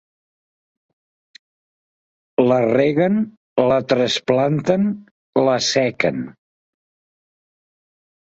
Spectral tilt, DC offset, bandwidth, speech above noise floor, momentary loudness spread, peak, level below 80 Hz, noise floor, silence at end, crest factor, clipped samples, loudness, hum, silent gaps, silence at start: -5 dB/octave; under 0.1%; 8 kHz; over 73 dB; 8 LU; -2 dBFS; -60 dBFS; under -90 dBFS; 2 s; 20 dB; under 0.1%; -18 LUFS; none; 3.37-3.56 s, 5.11-5.33 s; 2.4 s